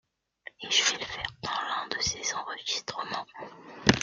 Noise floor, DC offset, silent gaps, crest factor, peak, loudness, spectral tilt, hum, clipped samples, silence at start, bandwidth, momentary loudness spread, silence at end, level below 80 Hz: -51 dBFS; under 0.1%; none; 30 dB; -2 dBFS; -29 LUFS; -2 dB/octave; none; under 0.1%; 0.6 s; 11 kHz; 20 LU; 0 s; -56 dBFS